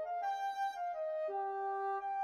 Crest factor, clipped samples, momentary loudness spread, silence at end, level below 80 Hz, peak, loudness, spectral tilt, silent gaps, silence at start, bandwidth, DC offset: 8 dB; under 0.1%; 1 LU; 0 s; -84 dBFS; -30 dBFS; -39 LUFS; -2 dB/octave; none; 0 s; 13.5 kHz; under 0.1%